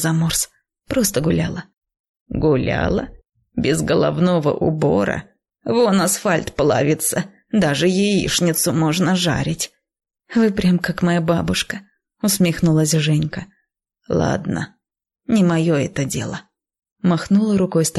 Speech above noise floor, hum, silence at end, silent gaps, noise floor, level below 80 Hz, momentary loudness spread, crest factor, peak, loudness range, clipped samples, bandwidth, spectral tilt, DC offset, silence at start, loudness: 52 dB; none; 0 s; 1.77-1.81 s, 1.99-2.14 s, 2.21-2.26 s, 16.92-16.96 s; -70 dBFS; -42 dBFS; 10 LU; 12 dB; -6 dBFS; 3 LU; under 0.1%; 12.5 kHz; -5 dB/octave; under 0.1%; 0 s; -19 LUFS